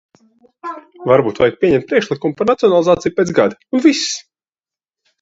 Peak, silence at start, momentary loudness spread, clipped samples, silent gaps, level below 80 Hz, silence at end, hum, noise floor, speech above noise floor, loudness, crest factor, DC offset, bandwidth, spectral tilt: 0 dBFS; 0.65 s; 14 LU; under 0.1%; none; -52 dBFS; 1 s; none; under -90 dBFS; over 75 dB; -15 LUFS; 16 dB; under 0.1%; 8 kHz; -5 dB/octave